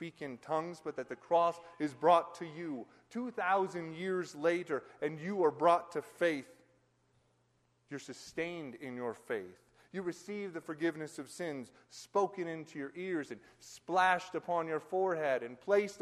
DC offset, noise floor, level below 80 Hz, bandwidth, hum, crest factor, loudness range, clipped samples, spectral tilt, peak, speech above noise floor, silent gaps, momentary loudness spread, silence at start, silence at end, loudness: under 0.1%; -74 dBFS; -80 dBFS; 13 kHz; none; 22 dB; 9 LU; under 0.1%; -5 dB/octave; -14 dBFS; 39 dB; none; 16 LU; 0 s; 0 s; -35 LUFS